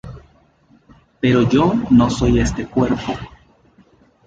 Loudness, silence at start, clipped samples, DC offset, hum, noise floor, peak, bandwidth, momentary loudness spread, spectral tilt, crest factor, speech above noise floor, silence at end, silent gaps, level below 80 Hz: -17 LUFS; 0.05 s; under 0.1%; under 0.1%; none; -54 dBFS; -2 dBFS; 7.8 kHz; 15 LU; -6.5 dB/octave; 16 dB; 38 dB; 1 s; none; -34 dBFS